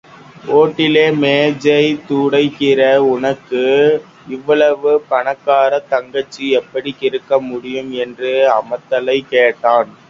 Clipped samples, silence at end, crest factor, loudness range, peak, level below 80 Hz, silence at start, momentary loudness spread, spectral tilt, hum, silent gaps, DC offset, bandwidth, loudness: under 0.1%; 0.2 s; 14 dB; 4 LU; 0 dBFS; -60 dBFS; 0.45 s; 9 LU; -6 dB/octave; none; none; under 0.1%; 7.6 kHz; -14 LUFS